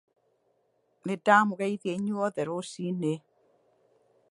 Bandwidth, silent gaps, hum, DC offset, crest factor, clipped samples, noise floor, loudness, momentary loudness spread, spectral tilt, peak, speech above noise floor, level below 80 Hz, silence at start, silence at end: 11.5 kHz; none; none; under 0.1%; 24 dB; under 0.1%; -72 dBFS; -28 LUFS; 13 LU; -6 dB/octave; -6 dBFS; 44 dB; -78 dBFS; 1.05 s; 1.15 s